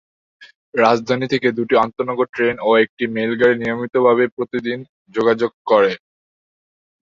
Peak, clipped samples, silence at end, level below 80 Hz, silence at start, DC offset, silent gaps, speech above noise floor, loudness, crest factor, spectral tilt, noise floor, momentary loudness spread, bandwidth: 0 dBFS; under 0.1%; 1.15 s; -60 dBFS; 0.4 s; under 0.1%; 0.55-0.72 s, 2.29-2.33 s, 2.89-2.97 s, 4.32-4.37 s, 4.89-5.05 s, 5.54-5.65 s; over 73 dB; -18 LUFS; 18 dB; -6 dB/octave; under -90 dBFS; 8 LU; 7.4 kHz